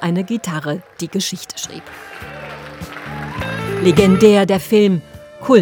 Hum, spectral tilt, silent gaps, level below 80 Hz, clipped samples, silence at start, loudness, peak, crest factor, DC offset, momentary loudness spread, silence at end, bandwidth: none; -5.5 dB/octave; none; -46 dBFS; under 0.1%; 0 s; -16 LUFS; 0 dBFS; 16 dB; under 0.1%; 20 LU; 0 s; over 20 kHz